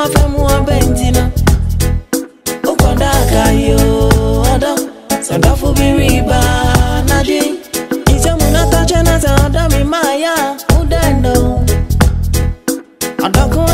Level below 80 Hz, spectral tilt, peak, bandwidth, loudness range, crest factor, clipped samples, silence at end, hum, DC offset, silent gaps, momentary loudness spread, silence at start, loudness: -16 dBFS; -5 dB/octave; 0 dBFS; 16.5 kHz; 1 LU; 10 dB; under 0.1%; 0 s; none; 0.3%; none; 7 LU; 0 s; -12 LUFS